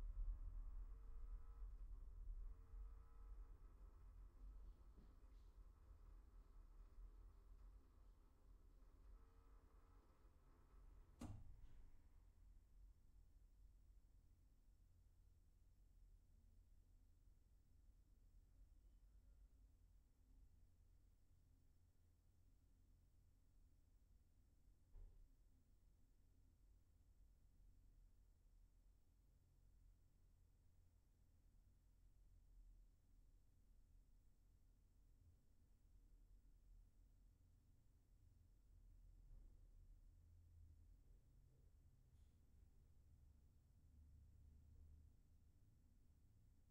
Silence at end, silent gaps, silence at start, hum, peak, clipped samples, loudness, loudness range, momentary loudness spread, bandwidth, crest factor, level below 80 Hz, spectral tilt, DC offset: 0 s; none; 0 s; none; -40 dBFS; under 0.1%; -63 LUFS; 7 LU; 10 LU; 5.4 kHz; 24 dB; -64 dBFS; -8 dB/octave; under 0.1%